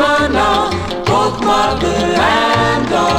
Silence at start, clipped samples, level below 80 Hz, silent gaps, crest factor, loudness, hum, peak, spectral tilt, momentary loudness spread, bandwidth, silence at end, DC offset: 0 s; under 0.1%; -32 dBFS; none; 12 dB; -13 LUFS; none; 0 dBFS; -4.5 dB/octave; 3 LU; 19 kHz; 0 s; under 0.1%